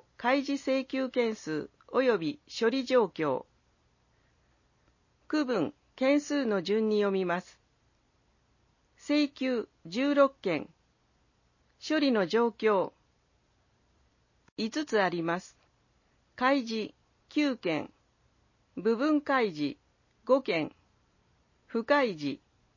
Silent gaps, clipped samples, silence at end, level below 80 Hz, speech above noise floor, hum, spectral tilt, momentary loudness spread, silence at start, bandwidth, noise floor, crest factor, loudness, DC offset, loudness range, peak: 14.52-14.56 s; under 0.1%; 0.4 s; -72 dBFS; 42 dB; none; -5.5 dB/octave; 10 LU; 0.2 s; 7.4 kHz; -70 dBFS; 20 dB; -30 LUFS; under 0.1%; 3 LU; -12 dBFS